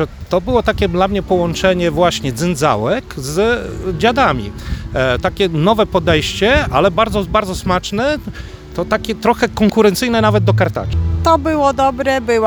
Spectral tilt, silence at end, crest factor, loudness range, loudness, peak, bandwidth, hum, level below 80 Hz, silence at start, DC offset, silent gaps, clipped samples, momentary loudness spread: -5.5 dB/octave; 0 s; 14 dB; 2 LU; -15 LUFS; 0 dBFS; over 20 kHz; none; -30 dBFS; 0 s; under 0.1%; none; under 0.1%; 7 LU